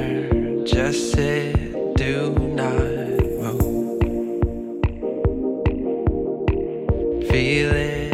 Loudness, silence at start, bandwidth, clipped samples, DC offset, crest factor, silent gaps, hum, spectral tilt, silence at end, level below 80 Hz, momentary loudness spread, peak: -22 LUFS; 0 s; 15.5 kHz; under 0.1%; under 0.1%; 16 dB; none; none; -6.5 dB/octave; 0 s; -30 dBFS; 4 LU; -6 dBFS